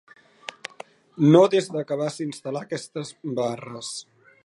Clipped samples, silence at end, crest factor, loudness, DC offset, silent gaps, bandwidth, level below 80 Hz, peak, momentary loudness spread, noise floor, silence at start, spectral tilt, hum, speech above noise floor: under 0.1%; 0.45 s; 22 dB; -24 LUFS; under 0.1%; none; 11.5 kHz; -74 dBFS; -2 dBFS; 23 LU; -46 dBFS; 1.15 s; -6 dB/octave; none; 23 dB